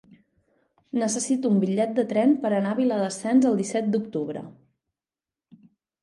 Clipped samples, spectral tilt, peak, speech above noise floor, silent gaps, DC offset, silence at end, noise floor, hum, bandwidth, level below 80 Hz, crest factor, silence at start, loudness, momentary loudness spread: under 0.1%; -5.5 dB/octave; -10 dBFS; over 67 dB; none; under 0.1%; 1.55 s; under -90 dBFS; none; 11.5 kHz; -74 dBFS; 16 dB; 0.95 s; -24 LUFS; 10 LU